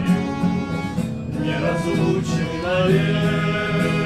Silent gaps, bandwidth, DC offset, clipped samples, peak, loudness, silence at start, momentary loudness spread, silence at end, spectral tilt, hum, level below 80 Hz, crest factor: none; 12.5 kHz; under 0.1%; under 0.1%; -6 dBFS; -21 LUFS; 0 s; 7 LU; 0 s; -6.5 dB/octave; none; -42 dBFS; 14 dB